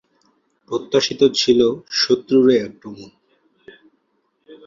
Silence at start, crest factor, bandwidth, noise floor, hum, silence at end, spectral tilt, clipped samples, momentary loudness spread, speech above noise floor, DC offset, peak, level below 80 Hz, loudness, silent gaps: 0.7 s; 18 dB; 7.6 kHz; -68 dBFS; none; 0.1 s; -4 dB/octave; under 0.1%; 20 LU; 50 dB; under 0.1%; -2 dBFS; -60 dBFS; -17 LUFS; none